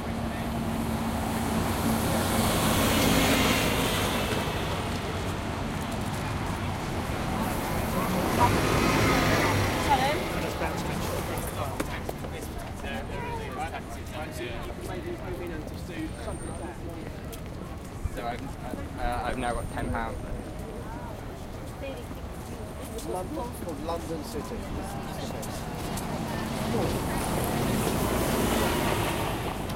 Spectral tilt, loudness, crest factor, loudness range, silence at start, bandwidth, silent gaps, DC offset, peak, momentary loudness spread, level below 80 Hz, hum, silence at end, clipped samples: -4.5 dB/octave; -29 LUFS; 20 dB; 11 LU; 0 s; 16.5 kHz; none; under 0.1%; -8 dBFS; 14 LU; -40 dBFS; none; 0 s; under 0.1%